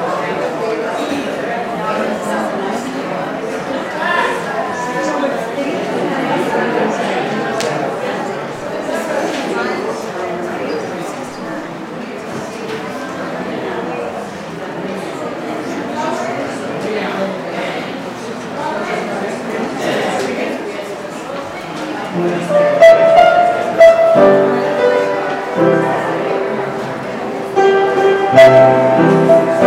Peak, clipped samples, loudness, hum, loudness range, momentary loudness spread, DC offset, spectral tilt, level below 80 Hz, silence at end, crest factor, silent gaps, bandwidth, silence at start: 0 dBFS; under 0.1%; -15 LUFS; none; 13 LU; 15 LU; under 0.1%; -5.5 dB/octave; -54 dBFS; 0 s; 14 dB; none; 15 kHz; 0 s